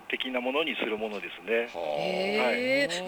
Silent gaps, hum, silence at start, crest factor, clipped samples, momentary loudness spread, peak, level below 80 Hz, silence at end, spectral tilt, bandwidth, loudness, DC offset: none; none; 0 s; 16 dB; under 0.1%; 7 LU; -14 dBFS; -70 dBFS; 0 s; -3.5 dB/octave; over 20 kHz; -29 LUFS; under 0.1%